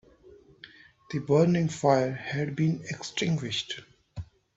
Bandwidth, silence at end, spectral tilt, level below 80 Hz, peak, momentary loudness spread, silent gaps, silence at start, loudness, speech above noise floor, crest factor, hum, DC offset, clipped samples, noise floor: 8 kHz; 0.3 s; -6 dB/octave; -60 dBFS; -8 dBFS; 19 LU; none; 0.3 s; -27 LUFS; 28 dB; 20 dB; none; under 0.1%; under 0.1%; -55 dBFS